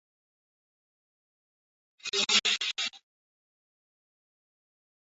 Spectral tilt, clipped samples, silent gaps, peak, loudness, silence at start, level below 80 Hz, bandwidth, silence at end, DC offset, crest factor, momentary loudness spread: 2.5 dB/octave; under 0.1%; none; -10 dBFS; -27 LUFS; 2.05 s; -80 dBFS; 8 kHz; 2.15 s; under 0.1%; 26 dB; 11 LU